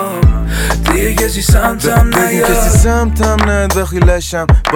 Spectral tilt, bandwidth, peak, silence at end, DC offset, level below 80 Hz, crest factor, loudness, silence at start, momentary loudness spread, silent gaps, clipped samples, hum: -5 dB/octave; 18.5 kHz; 0 dBFS; 0 s; under 0.1%; -14 dBFS; 10 dB; -12 LUFS; 0 s; 4 LU; none; under 0.1%; none